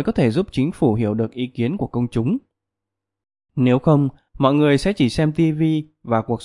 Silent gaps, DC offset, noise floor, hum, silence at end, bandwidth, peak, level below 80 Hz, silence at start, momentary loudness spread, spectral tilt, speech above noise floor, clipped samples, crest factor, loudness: none; under 0.1%; -84 dBFS; none; 0 s; 11.5 kHz; -2 dBFS; -46 dBFS; 0 s; 7 LU; -8 dB/octave; 65 dB; under 0.1%; 18 dB; -20 LUFS